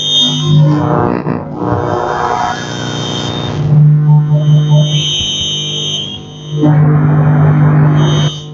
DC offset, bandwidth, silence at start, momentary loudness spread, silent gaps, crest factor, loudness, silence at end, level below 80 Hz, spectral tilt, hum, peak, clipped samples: under 0.1%; 7.2 kHz; 0 s; 9 LU; none; 10 dB; -11 LUFS; 0 s; -40 dBFS; -5.5 dB/octave; none; 0 dBFS; under 0.1%